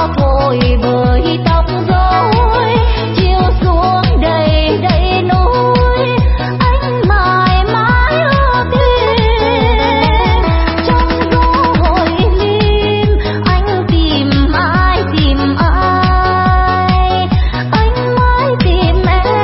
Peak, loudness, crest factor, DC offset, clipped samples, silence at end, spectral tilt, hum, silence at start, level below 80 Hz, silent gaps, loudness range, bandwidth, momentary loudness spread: 0 dBFS; -11 LUFS; 10 dB; under 0.1%; under 0.1%; 0 s; -10 dB/octave; none; 0 s; -16 dBFS; none; 1 LU; 5.8 kHz; 2 LU